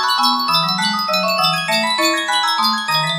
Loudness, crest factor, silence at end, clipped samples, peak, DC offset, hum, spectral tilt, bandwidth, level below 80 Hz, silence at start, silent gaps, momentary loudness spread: -15 LUFS; 14 dB; 0 s; under 0.1%; -2 dBFS; under 0.1%; none; -2.5 dB/octave; 16 kHz; -68 dBFS; 0 s; none; 2 LU